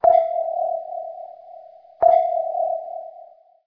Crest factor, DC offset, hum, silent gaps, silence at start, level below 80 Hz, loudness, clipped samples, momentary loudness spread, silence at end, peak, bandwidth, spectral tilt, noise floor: 18 dB; under 0.1%; none; none; 0 s; -64 dBFS; -21 LUFS; under 0.1%; 23 LU; 0.4 s; -4 dBFS; 3.7 kHz; -7.5 dB/octave; -46 dBFS